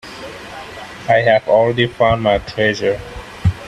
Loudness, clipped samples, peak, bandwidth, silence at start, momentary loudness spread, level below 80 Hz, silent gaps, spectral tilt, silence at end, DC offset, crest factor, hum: -15 LUFS; under 0.1%; 0 dBFS; 13 kHz; 0.05 s; 18 LU; -38 dBFS; none; -6 dB/octave; 0 s; under 0.1%; 16 dB; none